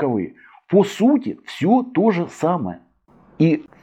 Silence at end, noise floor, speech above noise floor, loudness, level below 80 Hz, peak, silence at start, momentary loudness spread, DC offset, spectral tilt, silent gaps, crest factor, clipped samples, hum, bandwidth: 0.2 s; -53 dBFS; 35 dB; -19 LUFS; -64 dBFS; -4 dBFS; 0 s; 13 LU; under 0.1%; -7.5 dB/octave; none; 16 dB; under 0.1%; none; 13.5 kHz